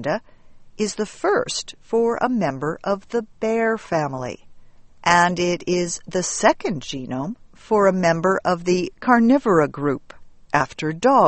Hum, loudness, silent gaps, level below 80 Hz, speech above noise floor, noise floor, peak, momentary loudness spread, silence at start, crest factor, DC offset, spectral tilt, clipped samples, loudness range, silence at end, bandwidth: none; -21 LUFS; none; -52 dBFS; 23 dB; -44 dBFS; 0 dBFS; 12 LU; 0 s; 20 dB; under 0.1%; -4.5 dB/octave; under 0.1%; 4 LU; 0 s; 8.8 kHz